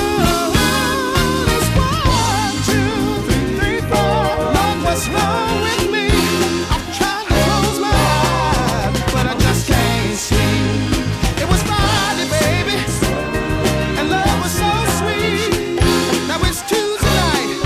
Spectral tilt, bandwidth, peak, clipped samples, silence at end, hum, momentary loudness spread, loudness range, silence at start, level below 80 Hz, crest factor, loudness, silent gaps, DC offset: -4.5 dB/octave; 16 kHz; 0 dBFS; under 0.1%; 0 s; none; 3 LU; 1 LU; 0 s; -26 dBFS; 16 dB; -16 LUFS; none; under 0.1%